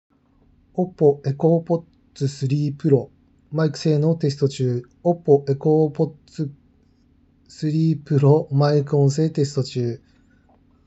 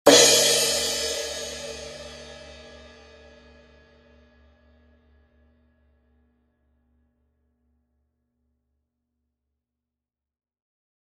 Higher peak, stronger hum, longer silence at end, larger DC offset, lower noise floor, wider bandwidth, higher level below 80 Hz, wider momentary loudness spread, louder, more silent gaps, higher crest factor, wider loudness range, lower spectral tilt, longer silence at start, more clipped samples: about the same, -2 dBFS vs 0 dBFS; neither; second, 0.9 s vs 8.5 s; neither; second, -57 dBFS vs -89 dBFS; second, 8.2 kHz vs 13.5 kHz; second, -62 dBFS vs -56 dBFS; second, 11 LU vs 29 LU; about the same, -21 LUFS vs -19 LUFS; neither; second, 18 dB vs 28 dB; second, 2 LU vs 28 LU; first, -8 dB/octave vs -0.5 dB/octave; first, 0.75 s vs 0.05 s; neither